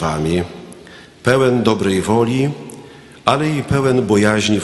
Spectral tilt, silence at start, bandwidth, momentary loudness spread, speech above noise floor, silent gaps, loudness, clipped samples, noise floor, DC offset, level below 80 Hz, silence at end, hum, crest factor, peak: -5.5 dB/octave; 0 s; 12 kHz; 15 LU; 25 dB; none; -16 LUFS; under 0.1%; -40 dBFS; under 0.1%; -42 dBFS; 0 s; none; 16 dB; 0 dBFS